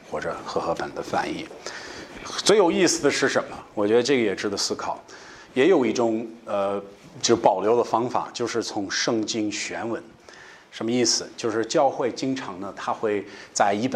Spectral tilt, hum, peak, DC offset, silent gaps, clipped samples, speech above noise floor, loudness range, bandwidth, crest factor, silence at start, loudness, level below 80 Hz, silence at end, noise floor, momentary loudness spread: -3.5 dB/octave; none; -2 dBFS; under 0.1%; none; under 0.1%; 23 dB; 4 LU; 13.5 kHz; 22 dB; 0 s; -24 LUFS; -62 dBFS; 0 s; -47 dBFS; 14 LU